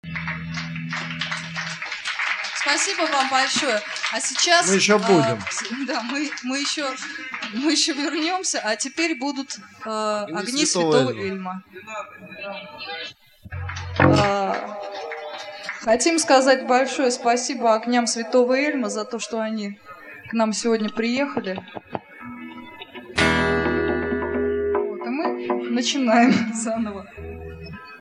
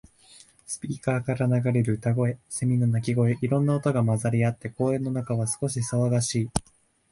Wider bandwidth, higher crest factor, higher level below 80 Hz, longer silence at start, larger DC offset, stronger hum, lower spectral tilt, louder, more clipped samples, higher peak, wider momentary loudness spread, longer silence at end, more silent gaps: about the same, 12 kHz vs 11.5 kHz; about the same, 22 dB vs 20 dB; about the same, -50 dBFS vs -54 dBFS; second, 0.05 s vs 0.7 s; neither; neither; second, -3.5 dB/octave vs -6.5 dB/octave; first, -22 LUFS vs -26 LUFS; neither; first, 0 dBFS vs -4 dBFS; first, 17 LU vs 5 LU; second, 0 s vs 0.5 s; neither